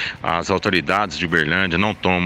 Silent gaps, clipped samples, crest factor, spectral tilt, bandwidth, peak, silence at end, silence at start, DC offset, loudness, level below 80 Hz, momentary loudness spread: none; under 0.1%; 16 dB; -5 dB/octave; 15 kHz; -4 dBFS; 0 s; 0 s; under 0.1%; -19 LUFS; -44 dBFS; 3 LU